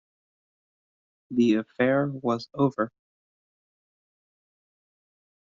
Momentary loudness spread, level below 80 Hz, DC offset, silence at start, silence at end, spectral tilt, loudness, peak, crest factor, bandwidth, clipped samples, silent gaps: 8 LU; -72 dBFS; under 0.1%; 1.3 s; 2.6 s; -6 dB/octave; -26 LUFS; -10 dBFS; 20 dB; 7.4 kHz; under 0.1%; none